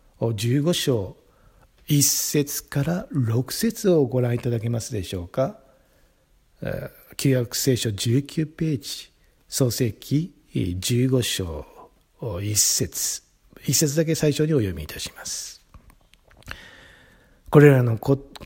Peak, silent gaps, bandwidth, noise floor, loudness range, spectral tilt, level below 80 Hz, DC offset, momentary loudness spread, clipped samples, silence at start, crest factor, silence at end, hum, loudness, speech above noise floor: 0 dBFS; none; 16.5 kHz; -60 dBFS; 4 LU; -4.5 dB/octave; -50 dBFS; under 0.1%; 15 LU; under 0.1%; 0.2 s; 24 dB; 0 s; none; -23 LUFS; 38 dB